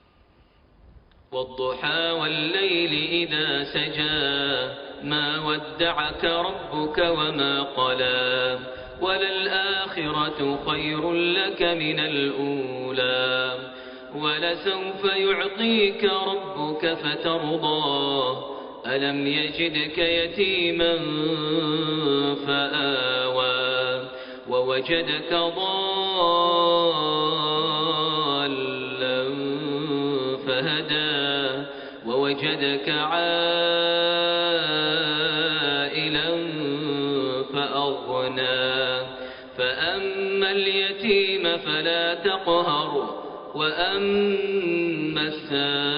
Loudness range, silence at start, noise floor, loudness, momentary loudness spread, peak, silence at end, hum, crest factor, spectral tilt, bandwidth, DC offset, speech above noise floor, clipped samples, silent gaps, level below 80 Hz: 3 LU; 0.95 s; -57 dBFS; -23 LUFS; 7 LU; -8 dBFS; 0 s; none; 16 dB; -1.5 dB/octave; 5.2 kHz; under 0.1%; 33 dB; under 0.1%; none; -56 dBFS